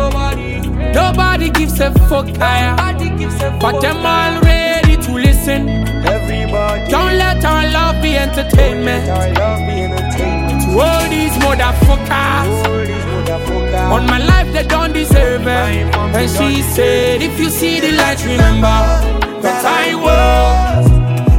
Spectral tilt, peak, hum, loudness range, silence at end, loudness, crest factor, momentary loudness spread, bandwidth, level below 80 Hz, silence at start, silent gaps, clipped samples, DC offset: -5.5 dB/octave; 0 dBFS; none; 2 LU; 0 s; -13 LUFS; 12 dB; 6 LU; 17 kHz; -16 dBFS; 0 s; none; under 0.1%; under 0.1%